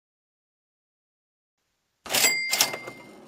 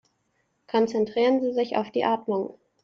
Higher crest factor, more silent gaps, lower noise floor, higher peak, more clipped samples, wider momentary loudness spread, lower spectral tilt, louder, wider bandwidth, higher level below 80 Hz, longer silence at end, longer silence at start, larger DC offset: first, 30 dB vs 16 dB; neither; second, -50 dBFS vs -72 dBFS; first, -2 dBFS vs -10 dBFS; neither; first, 17 LU vs 7 LU; second, 1 dB/octave vs -6 dB/octave; first, -22 LUFS vs -25 LUFS; first, 16 kHz vs 7.2 kHz; about the same, -72 dBFS vs -72 dBFS; second, 0 s vs 0.3 s; first, 2.05 s vs 0.75 s; neither